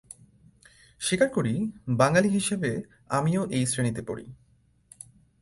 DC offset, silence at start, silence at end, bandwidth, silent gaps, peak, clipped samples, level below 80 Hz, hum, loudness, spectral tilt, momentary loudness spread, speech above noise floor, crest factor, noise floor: under 0.1%; 1 s; 1.05 s; 11.5 kHz; none; -6 dBFS; under 0.1%; -58 dBFS; none; -26 LUFS; -5 dB/octave; 18 LU; 33 dB; 22 dB; -58 dBFS